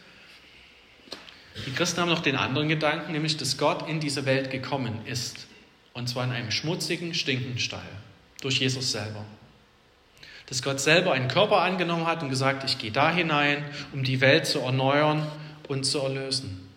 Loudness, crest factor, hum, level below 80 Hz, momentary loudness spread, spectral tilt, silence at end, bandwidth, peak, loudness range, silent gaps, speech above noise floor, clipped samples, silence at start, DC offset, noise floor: -25 LUFS; 22 dB; none; -66 dBFS; 16 LU; -4 dB/octave; 0.05 s; 16 kHz; -6 dBFS; 6 LU; none; 33 dB; under 0.1%; 0.05 s; under 0.1%; -59 dBFS